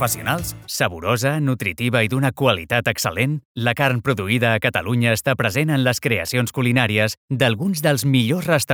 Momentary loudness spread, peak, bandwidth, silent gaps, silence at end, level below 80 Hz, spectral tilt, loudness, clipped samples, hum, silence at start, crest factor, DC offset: 4 LU; -2 dBFS; over 20 kHz; 3.45-3.55 s, 7.17-7.28 s; 0 s; -50 dBFS; -5 dB/octave; -19 LUFS; under 0.1%; none; 0 s; 18 dB; under 0.1%